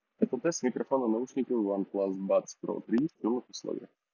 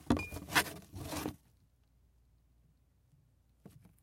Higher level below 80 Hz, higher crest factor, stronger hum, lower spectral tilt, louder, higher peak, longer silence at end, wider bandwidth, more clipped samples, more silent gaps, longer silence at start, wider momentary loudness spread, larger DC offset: second, -80 dBFS vs -56 dBFS; second, 18 dB vs 28 dB; neither; first, -5.5 dB/octave vs -3.5 dB/octave; first, -32 LUFS vs -36 LUFS; about the same, -12 dBFS vs -14 dBFS; about the same, 0.25 s vs 0.25 s; second, 7.4 kHz vs 16.5 kHz; neither; neither; first, 0.2 s vs 0 s; second, 9 LU vs 12 LU; neither